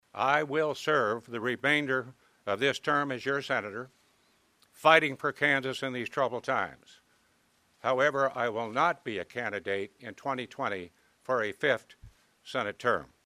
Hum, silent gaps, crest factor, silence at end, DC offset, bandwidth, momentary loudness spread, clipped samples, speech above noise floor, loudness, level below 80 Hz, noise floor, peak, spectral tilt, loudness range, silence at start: none; none; 26 dB; 0.2 s; under 0.1%; 15 kHz; 11 LU; under 0.1%; 39 dB; -29 LUFS; -70 dBFS; -69 dBFS; -4 dBFS; -4.5 dB/octave; 5 LU; 0.15 s